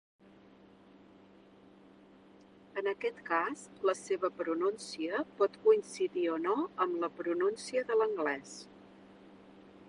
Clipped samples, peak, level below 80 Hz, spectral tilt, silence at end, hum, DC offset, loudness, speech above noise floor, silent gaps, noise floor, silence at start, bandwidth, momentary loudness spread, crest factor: under 0.1%; -14 dBFS; -80 dBFS; -4 dB/octave; 0.05 s; none; under 0.1%; -33 LUFS; 26 dB; none; -59 dBFS; 2.75 s; 11 kHz; 9 LU; 20 dB